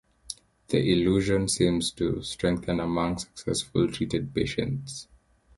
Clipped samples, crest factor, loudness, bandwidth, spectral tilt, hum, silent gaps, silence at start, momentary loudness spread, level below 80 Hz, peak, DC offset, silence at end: under 0.1%; 18 dB; -27 LUFS; 12 kHz; -5 dB/octave; none; none; 0.3 s; 16 LU; -48 dBFS; -8 dBFS; under 0.1%; 0.55 s